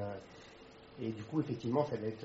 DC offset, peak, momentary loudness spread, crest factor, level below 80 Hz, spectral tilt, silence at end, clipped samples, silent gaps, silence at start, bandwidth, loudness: under 0.1%; -18 dBFS; 20 LU; 20 dB; -70 dBFS; -7 dB/octave; 0 s; under 0.1%; none; 0 s; 7.6 kHz; -38 LUFS